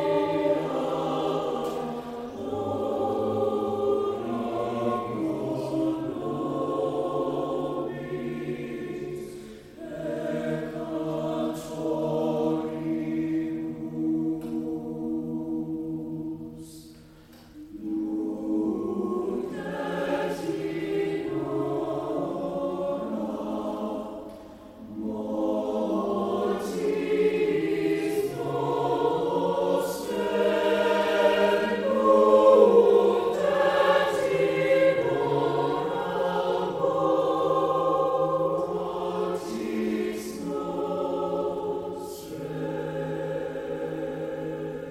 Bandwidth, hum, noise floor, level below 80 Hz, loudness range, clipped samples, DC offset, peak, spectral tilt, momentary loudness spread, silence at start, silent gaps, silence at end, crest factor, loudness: 15.5 kHz; none; -50 dBFS; -60 dBFS; 12 LU; under 0.1%; under 0.1%; -6 dBFS; -6.5 dB/octave; 11 LU; 0 s; none; 0 s; 22 dB; -27 LUFS